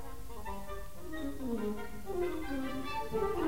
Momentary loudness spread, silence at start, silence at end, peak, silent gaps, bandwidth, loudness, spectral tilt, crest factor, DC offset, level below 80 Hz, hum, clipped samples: 10 LU; 0 s; 0 s; -22 dBFS; none; 16 kHz; -39 LUFS; -6 dB/octave; 16 dB; 1%; -50 dBFS; none; under 0.1%